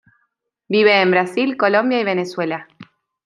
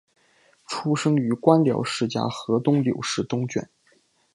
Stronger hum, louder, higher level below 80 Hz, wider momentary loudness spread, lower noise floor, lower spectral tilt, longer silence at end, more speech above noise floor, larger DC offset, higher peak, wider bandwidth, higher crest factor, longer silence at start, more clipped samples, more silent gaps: neither; first, -17 LUFS vs -23 LUFS; second, -70 dBFS vs -64 dBFS; about the same, 11 LU vs 10 LU; first, -70 dBFS vs -63 dBFS; about the same, -6 dB/octave vs -6 dB/octave; second, 0.45 s vs 0.7 s; first, 54 dB vs 40 dB; neither; about the same, -2 dBFS vs -2 dBFS; about the same, 11.5 kHz vs 11.5 kHz; about the same, 18 dB vs 22 dB; about the same, 0.7 s vs 0.7 s; neither; neither